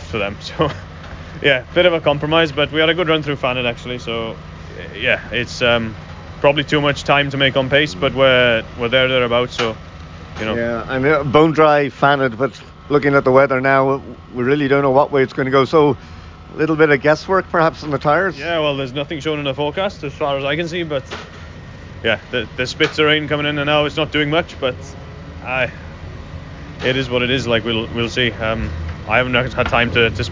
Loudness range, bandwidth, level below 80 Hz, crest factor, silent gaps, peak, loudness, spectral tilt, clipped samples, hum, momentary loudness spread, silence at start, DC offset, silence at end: 6 LU; 7.6 kHz; -38 dBFS; 16 dB; none; -2 dBFS; -17 LUFS; -5.5 dB/octave; under 0.1%; none; 19 LU; 0 s; under 0.1%; 0 s